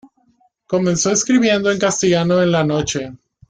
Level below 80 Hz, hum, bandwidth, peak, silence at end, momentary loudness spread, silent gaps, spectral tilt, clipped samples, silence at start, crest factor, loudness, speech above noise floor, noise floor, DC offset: -50 dBFS; none; 9.6 kHz; -4 dBFS; 0.35 s; 8 LU; none; -4.5 dB/octave; under 0.1%; 0.7 s; 14 dB; -16 LUFS; 43 dB; -59 dBFS; under 0.1%